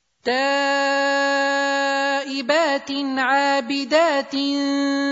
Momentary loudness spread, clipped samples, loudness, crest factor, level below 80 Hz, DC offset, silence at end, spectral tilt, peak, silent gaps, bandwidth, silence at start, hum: 4 LU; under 0.1%; -20 LUFS; 16 dB; -72 dBFS; under 0.1%; 0 s; -1.5 dB/octave; -6 dBFS; none; 8 kHz; 0.25 s; none